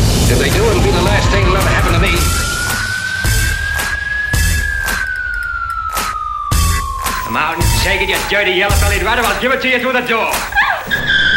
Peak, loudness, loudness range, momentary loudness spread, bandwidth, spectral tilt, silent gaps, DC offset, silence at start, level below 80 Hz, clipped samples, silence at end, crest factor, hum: -2 dBFS; -14 LUFS; 4 LU; 6 LU; 16.5 kHz; -3.5 dB/octave; none; under 0.1%; 0 s; -20 dBFS; under 0.1%; 0 s; 12 dB; none